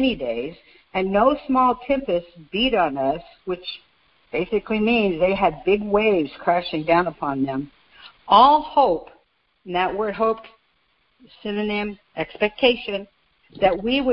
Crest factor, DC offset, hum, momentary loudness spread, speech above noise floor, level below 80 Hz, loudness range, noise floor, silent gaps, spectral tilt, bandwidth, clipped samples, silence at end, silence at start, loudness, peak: 20 dB; under 0.1%; none; 12 LU; 44 dB; -48 dBFS; 6 LU; -65 dBFS; none; -9 dB/octave; 5.6 kHz; under 0.1%; 0 s; 0 s; -21 LUFS; -2 dBFS